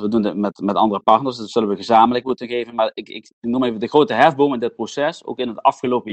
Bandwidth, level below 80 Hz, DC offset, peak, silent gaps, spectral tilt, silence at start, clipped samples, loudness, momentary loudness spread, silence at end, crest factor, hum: 8.8 kHz; -58 dBFS; under 0.1%; 0 dBFS; 3.33-3.42 s; -6 dB/octave; 0 s; under 0.1%; -18 LUFS; 10 LU; 0 s; 18 dB; none